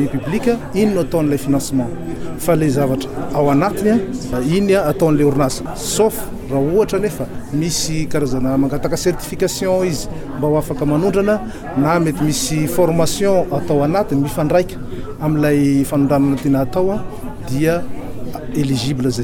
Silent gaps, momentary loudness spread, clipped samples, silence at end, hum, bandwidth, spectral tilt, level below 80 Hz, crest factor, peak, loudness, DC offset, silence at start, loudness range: none; 9 LU; under 0.1%; 0 s; none; 18.5 kHz; -6 dB/octave; -34 dBFS; 14 dB; -4 dBFS; -17 LUFS; under 0.1%; 0 s; 2 LU